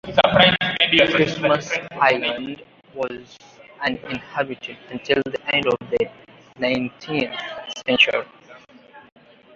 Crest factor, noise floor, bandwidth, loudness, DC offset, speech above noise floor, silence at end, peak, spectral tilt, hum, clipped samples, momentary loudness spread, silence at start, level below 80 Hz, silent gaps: 20 dB; -47 dBFS; 7.6 kHz; -20 LUFS; under 0.1%; 25 dB; 0.55 s; -2 dBFS; -4.5 dB/octave; none; under 0.1%; 16 LU; 0.05 s; -54 dBFS; none